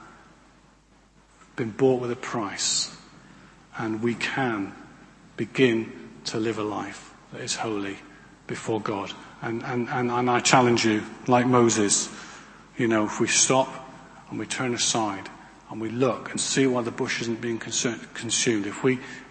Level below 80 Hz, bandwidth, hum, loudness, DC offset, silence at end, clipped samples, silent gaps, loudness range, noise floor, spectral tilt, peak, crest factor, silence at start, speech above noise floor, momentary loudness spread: -62 dBFS; 8.8 kHz; none; -25 LUFS; under 0.1%; 0 s; under 0.1%; none; 7 LU; -57 dBFS; -3.5 dB/octave; -2 dBFS; 24 dB; 0 s; 32 dB; 17 LU